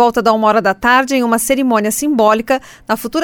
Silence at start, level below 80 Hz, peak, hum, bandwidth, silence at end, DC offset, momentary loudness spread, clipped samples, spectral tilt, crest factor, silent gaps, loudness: 0 s; -46 dBFS; 0 dBFS; none; 20 kHz; 0 s; under 0.1%; 7 LU; under 0.1%; -3.5 dB/octave; 14 dB; none; -13 LUFS